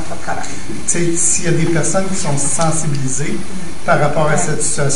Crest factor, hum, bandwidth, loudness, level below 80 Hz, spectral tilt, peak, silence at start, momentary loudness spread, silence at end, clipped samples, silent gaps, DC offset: 16 dB; none; 11 kHz; -17 LUFS; -38 dBFS; -4 dB/octave; 0 dBFS; 0 s; 10 LU; 0 s; under 0.1%; none; 20%